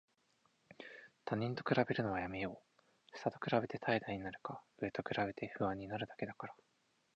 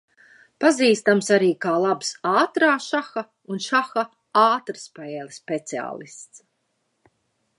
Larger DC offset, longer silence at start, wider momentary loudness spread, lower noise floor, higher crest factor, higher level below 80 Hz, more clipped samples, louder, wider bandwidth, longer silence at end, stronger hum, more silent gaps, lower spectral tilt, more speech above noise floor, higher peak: neither; about the same, 0.7 s vs 0.6 s; about the same, 16 LU vs 16 LU; first, -77 dBFS vs -73 dBFS; first, 24 dB vs 18 dB; first, -70 dBFS vs -78 dBFS; neither; second, -40 LUFS vs -21 LUFS; second, 8.4 kHz vs 11.5 kHz; second, 0.6 s vs 1.2 s; neither; neither; first, -7.5 dB/octave vs -4 dB/octave; second, 37 dB vs 51 dB; second, -18 dBFS vs -4 dBFS